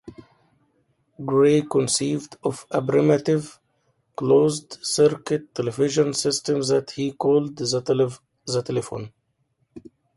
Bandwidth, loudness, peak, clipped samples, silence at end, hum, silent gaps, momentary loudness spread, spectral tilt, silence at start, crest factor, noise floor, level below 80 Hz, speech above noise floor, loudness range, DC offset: 11.5 kHz; -22 LUFS; -6 dBFS; under 0.1%; 0.35 s; none; none; 11 LU; -5 dB/octave; 0.05 s; 18 dB; -70 dBFS; -62 dBFS; 48 dB; 2 LU; under 0.1%